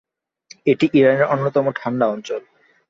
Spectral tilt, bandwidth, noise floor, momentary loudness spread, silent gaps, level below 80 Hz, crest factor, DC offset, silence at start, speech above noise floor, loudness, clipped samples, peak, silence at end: -7 dB/octave; 7.6 kHz; -49 dBFS; 13 LU; none; -62 dBFS; 16 dB; under 0.1%; 0.65 s; 32 dB; -18 LUFS; under 0.1%; -2 dBFS; 0.5 s